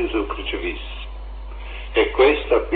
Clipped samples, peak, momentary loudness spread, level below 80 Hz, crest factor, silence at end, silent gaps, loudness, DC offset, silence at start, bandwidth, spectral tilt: under 0.1%; -4 dBFS; 20 LU; -32 dBFS; 18 dB; 0 s; none; -20 LUFS; under 0.1%; 0 s; 4.7 kHz; -9 dB/octave